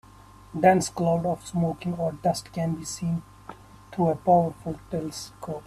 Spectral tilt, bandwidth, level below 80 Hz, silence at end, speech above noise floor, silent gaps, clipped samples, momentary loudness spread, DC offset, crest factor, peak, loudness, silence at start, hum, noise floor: -6 dB/octave; 13.5 kHz; -54 dBFS; 0.05 s; 24 dB; none; under 0.1%; 16 LU; under 0.1%; 20 dB; -6 dBFS; -26 LUFS; 0.5 s; none; -50 dBFS